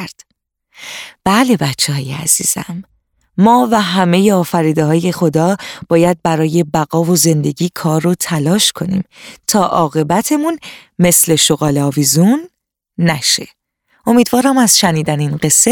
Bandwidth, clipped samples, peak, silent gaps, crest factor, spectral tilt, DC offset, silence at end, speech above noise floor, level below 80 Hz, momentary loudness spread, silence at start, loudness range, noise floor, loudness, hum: 19.5 kHz; under 0.1%; 0 dBFS; none; 14 dB; -4 dB/octave; under 0.1%; 0 s; 55 dB; -48 dBFS; 12 LU; 0 s; 2 LU; -67 dBFS; -13 LUFS; none